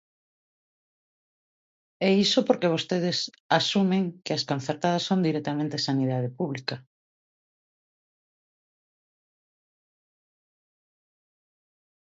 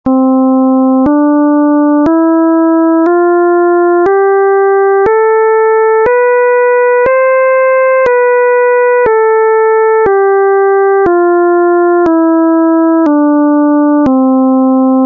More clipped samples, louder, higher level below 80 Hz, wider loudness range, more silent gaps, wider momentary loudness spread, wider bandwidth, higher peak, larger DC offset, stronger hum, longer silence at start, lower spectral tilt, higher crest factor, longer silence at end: neither; second, -26 LUFS vs -8 LUFS; second, -74 dBFS vs -46 dBFS; first, 9 LU vs 0 LU; first, 3.40-3.49 s vs none; first, 8 LU vs 0 LU; first, 7.8 kHz vs 3.3 kHz; second, -6 dBFS vs -2 dBFS; neither; neither; first, 2 s vs 0.05 s; second, -5 dB/octave vs -9 dB/octave; first, 22 dB vs 6 dB; first, 5.25 s vs 0 s